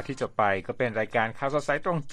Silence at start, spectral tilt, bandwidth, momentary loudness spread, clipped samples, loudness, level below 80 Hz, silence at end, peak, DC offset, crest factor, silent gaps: 0 s; -6 dB/octave; 11 kHz; 3 LU; under 0.1%; -27 LUFS; -56 dBFS; 0 s; -10 dBFS; under 0.1%; 18 dB; none